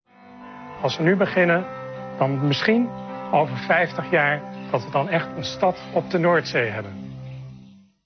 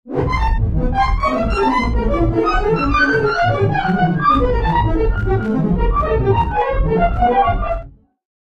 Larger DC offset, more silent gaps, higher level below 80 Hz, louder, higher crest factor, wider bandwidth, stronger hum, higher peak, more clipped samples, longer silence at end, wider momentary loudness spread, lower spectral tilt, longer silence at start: neither; neither; second, -60 dBFS vs -22 dBFS; second, -22 LUFS vs -17 LUFS; first, 18 dB vs 12 dB; second, 6.6 kHz vs 7.8 kHz; neither; about the same, -4 dBFS vs -2 dBFS; neither; second, 0.35 s vs 0.6 s; first, 17 LU vs 4 LU; second, -6.5 dB/octave vs -8 dB/octave; first, 0.25 s vs 0.05 s